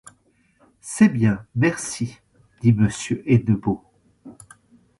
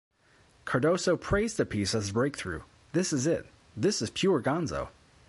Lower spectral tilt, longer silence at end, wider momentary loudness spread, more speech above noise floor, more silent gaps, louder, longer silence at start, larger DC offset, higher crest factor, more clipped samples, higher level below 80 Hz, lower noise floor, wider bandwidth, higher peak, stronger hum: first, -6.5 dB/octave vs -5 dB/octave; first, 0.65 s vs 0.4 s; about the same, 13 LU vs 11 LU; first, 42 dB vs 34 dB; neither; first, -21 LUFS vs -29 LUFS; first, 0.85 s vs 0.65 s; neither; about the same, 20 dB vs 16 dB; neither; about the same, -50 dBFS vs -50 dBFS; about the same, -61 dBFS vs -62 dBFS; about the same, 11.5 kHz vs 11.5 kHz; first, -2 dBFS vs -14 dBFS; neither